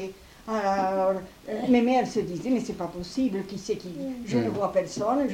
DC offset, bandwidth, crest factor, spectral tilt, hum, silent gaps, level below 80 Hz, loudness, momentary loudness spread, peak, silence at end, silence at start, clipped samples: under 0.1%; 16 kHz; 18 dB; -6 dB/octave; none; none; -56 dBFS; -27 LUFS; 11 LU; -10 dBFS; 0 s; 0 s; under 0.1%